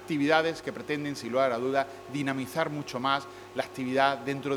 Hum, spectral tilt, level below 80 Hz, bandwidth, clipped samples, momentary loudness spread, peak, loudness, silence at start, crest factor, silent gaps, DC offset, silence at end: none; -5 dB/octave; -68 dBFS; 18.5 kHz; under 0.1%; 10 LU; -8 dBFS; -29 LUFS; 0 s; 22 dB; none; under 0.1%; 0 s